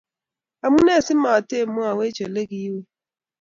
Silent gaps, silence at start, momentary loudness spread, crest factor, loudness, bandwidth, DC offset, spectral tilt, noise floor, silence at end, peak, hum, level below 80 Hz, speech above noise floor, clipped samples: none; 0.65 s; 13 LU; 18 dB; -20 LUFS; 7.6 kHz; under 0.1%; -5 dB/octave; -89 dBFS; 0.6 s; -4 dBFS; none; -56 dBFS; 69 dB; under 0.1%